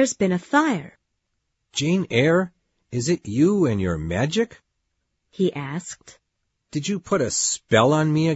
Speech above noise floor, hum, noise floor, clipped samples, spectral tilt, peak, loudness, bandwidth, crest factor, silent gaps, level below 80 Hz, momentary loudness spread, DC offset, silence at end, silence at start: 54 dB; none; -76 dBFS; under 0.1%; -5 dB/octave; -4 dBFS; -22 LUFS; 8 kHz; 20 dB; none; -52 dBFS; 12 LU; under 0.1%; 0 s; 0 s